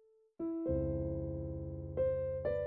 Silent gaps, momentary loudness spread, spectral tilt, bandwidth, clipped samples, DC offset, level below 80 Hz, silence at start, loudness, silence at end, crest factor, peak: none; 8 LU; -10.5 dB/octave; 4.5 kHz; under 0.1%; under 0.1%; -50 dBFS; 0.4 s; -38 LUFS; 0 s; 12 dB; -24 dBFS